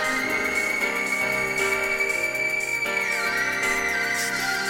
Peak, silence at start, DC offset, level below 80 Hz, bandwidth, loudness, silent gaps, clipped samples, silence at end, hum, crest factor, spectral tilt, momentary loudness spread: -12 dBFS; 0 s; under 0.1%; -54 dBFS; 17 kHz; -23 LUFS; none; under 0.1%; 0 s; none; 14 dB; -1.5 dB/octave; 1 LU